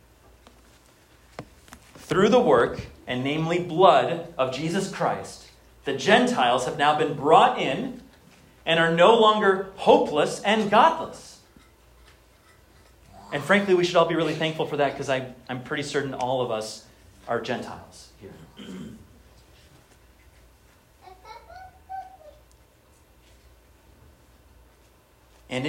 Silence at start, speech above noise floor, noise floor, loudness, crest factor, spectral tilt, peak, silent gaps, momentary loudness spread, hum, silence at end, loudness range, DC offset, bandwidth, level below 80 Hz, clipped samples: 1.4 s; 35 dB; -57 dBFS; -22 LUFS; 22 dB; -5 dB/octave; -4 dBFS; none; 23 LU; none; 0 s; 11 LU; under 0.1%; 16 kHz; -58 dBFS; under 0.1%